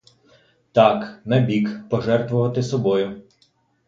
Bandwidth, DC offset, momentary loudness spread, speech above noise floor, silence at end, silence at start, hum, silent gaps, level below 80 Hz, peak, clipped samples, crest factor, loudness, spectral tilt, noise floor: 7.6 kHz; under 0.1%; 8 LU; 43 dB; 0.65 s; 0.75 s; none; none; -58 dBFS; 0 dBFS; under 0.1%; 20 dB; -20 LUFS; -7.5 dB/octave; -62 dBFS